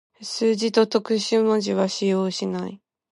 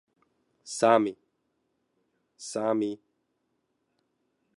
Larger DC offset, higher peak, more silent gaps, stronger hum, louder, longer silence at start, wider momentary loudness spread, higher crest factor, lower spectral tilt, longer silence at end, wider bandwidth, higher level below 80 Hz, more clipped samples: neither; about the same, -6 dBFS vs -8 dBFS; neither; neither; first, -22 LUFS vs -27 LUFS; second, 0.2 s vs 0.65 s; second, 9 LU vs 19 LU; second, 16 dB vs 24 dB; about the same, -5 dB/octave vs -4.5 dB/octave; second, 0.35 s vs 1.6 s; about the same, 11.5 kHz vs 11.5 kHz; first, -72 dBFS vs -80 dBFS; neither